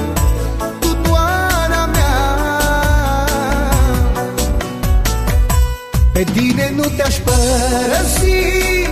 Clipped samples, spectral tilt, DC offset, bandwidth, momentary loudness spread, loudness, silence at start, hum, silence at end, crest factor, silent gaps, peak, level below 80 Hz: under 0.1%; -4.5 dB/octave; under 0.1%; 15.5 kHz; 4 LU; -15 LUFS; 0 s; none; 0 s; 12 dB; none; 0 dBFS; -18 dBFS